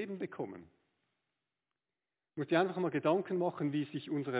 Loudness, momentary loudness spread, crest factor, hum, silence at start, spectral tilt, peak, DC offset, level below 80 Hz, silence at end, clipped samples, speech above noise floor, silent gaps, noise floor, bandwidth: -35 LUFS; 13 LU; 22 dB; none; 0 s; -5.5 dB/octave; -16 dBFS; under 0.1%; -82 dBFS; 0 s; under 0.1%; over 55 dB; none; under -90 dBFS; 4 kHz